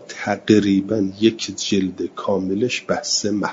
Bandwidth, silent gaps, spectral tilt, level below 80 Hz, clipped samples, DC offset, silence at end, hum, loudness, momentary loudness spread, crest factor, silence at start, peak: 7.8 kHz; none; -4.5 dB/octave; -62 dBFS; under 0.1%; under 0.1%; 0 s; none; -20 LUFS; 9 LU; 18 dB; 0 s; -2 dBFS